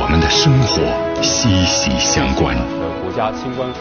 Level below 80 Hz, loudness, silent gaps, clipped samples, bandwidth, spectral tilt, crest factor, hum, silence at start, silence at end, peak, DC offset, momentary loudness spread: -28 dBFS; -15 LUFS; none; under 0.1%; 6.8 kHz; -4 dB/octave; 14 dB; none; 0 s; 0 s; -2 dBFS; under 0.1%; 10 LU